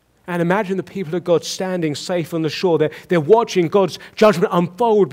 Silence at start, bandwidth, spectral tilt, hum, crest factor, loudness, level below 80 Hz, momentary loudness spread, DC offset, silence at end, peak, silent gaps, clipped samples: 0.25 s; 16 kHz; -6 dB/octave; none; 16 dB; -18 LUFS; -60 dBFS; 9 LU; under 0.1%; 0 s; -2 dBFS; none; under 0.1%